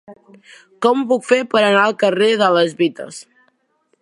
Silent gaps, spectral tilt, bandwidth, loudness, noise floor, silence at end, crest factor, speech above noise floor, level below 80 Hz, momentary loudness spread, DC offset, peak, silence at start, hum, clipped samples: none; -4.5 dB/octave; 11.5 kHz; -15 LUFS; -64 dBFS; 0.8 s; 16 dB; 48 dB; -72 dBFS; 11 LU; under 0.1%; 0 dBFS; 0.1 s; none; under 0.1%